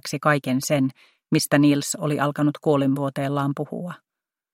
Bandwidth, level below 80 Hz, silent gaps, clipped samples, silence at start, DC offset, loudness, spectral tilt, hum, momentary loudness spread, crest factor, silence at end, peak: 16.5 kHz; -66 dBFS; none; under 0.1%; 0.05 s; under 0.1%; -22 LUFS; -5.5 dB/octave; none; 12 LU; 20 dB; 0.6 s; -2 dBFS